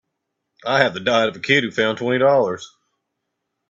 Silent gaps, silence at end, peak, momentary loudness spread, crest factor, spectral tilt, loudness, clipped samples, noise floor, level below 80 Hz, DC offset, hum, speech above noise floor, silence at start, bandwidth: none; 1.05 s; 0 dBFS; 8 LU; 20 dB; -4.5 dB/octave; -18 LUFS; under 0.1%; -77 dBFS; -62 dBFS; under 0.1%; none; 59 dB; 0.65 s; 7.8 kHz